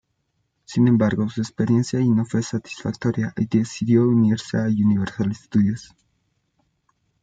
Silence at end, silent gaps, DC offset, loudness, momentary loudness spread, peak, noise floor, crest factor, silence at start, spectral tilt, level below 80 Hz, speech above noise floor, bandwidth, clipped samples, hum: 1.4 s; none; under 0.1%; -21 LUFS; 9 LU; -6 dBFS; -72 dBFS; 16 dB; 0.7 s; -7.5 dB/octave; -58 dBFS; 52 dB; 9 kHz; under 0.1%; none